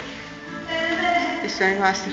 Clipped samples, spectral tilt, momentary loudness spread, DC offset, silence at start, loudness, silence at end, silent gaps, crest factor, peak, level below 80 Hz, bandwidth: under 0.1%; -3.5 dB/octave; 15 LU; under 0.1%; 0 s; -22 LUFS; 0 s; none; 18 dB; -6 dBFS; -54 dBFS; 8 kHz